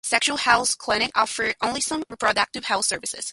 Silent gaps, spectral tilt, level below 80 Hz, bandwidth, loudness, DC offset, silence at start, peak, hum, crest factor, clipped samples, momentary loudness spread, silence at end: none; -0.5 dB/octave; -56 dBFS; 12 kHz; -22 LUFS; under 0.1%; 0.05 s; -4 dBFS; none; 20 dB; under 0.1%; 5 LU; 0 s